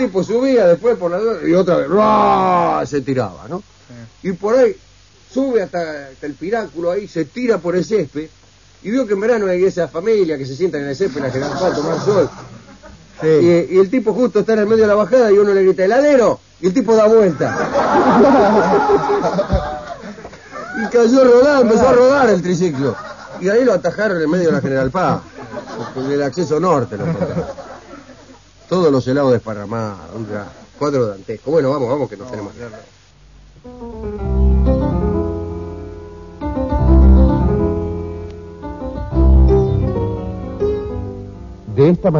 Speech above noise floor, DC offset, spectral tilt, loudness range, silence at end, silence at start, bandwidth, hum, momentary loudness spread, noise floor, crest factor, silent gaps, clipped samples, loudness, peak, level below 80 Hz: 30 dB; 0.2%; -7.5 dB/octave; 8 LU; 0 s; 0 s; 7.4 kHz; none; 18 LU; -45 dBFS; 16 dB; none; under 0.1%; -15 LUFS; 0 dBFS; -24 dBFS